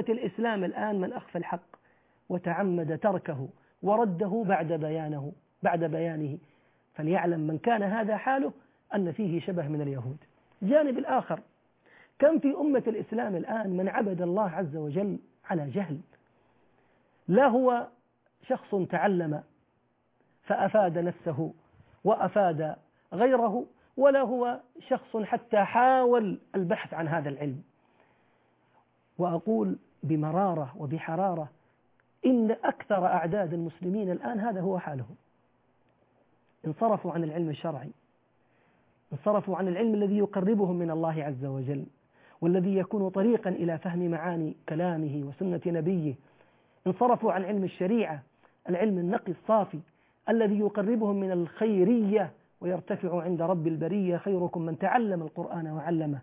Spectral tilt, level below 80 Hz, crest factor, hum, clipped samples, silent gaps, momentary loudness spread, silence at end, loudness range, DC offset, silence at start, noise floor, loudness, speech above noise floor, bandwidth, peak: -7 dB/octave; -74 dBFS; 18 dB; none; under 0.1%; none; 12 LU; 0 s; 5 LU; under 0.1%; 0 s; -71 dBFS; -29 LUFS; 43 dB; 3.9 kHz; -10 dBFS